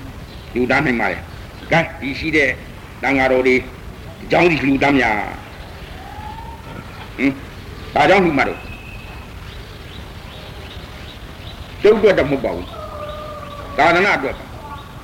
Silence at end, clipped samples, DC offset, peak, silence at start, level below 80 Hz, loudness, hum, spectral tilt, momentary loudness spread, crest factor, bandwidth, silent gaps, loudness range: 0 s; under 0.1%; under 0.1%; -2 dBFS; 0 s; -38 dBFS; -16 LUFS; none; -6 dB/octave; 21 LU; 18 dB; 16.5 kHz; none; 5 LU